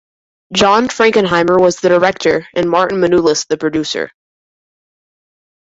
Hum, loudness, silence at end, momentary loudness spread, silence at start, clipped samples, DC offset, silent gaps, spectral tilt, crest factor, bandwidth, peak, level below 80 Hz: none; -13 LUFS; 1.7 s; 7 LU; 0.5 s; under 0.1%; under 0.1%; none; -4 dB/octave; 14 dB; 8 kHz; 0 dBFS; -50 dBFS